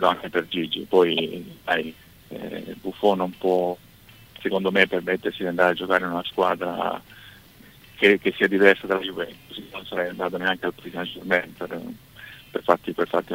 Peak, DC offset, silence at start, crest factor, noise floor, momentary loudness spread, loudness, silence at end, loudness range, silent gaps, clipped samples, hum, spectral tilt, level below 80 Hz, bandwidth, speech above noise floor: 0 dBFS; under 0.1%; 0 s; 24 dB; -50 dBFS; 17 LU; -23 LUFS; 0 s; 5 LU; none; under 0.1%; none; -5.5 dB/octave; -60 dBFS; 16 kHz; 26 dB